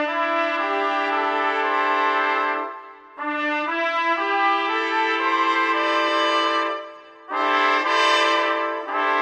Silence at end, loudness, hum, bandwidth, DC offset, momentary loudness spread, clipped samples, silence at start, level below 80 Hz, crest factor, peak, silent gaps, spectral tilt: 0 s; -21 LUFS; none; 10 kHz; under 0.1%; 8 LU; under 0.1%; 0 s; -78 dBFS; 14 dB; -6 dBFS; none; -0.5 dB/octave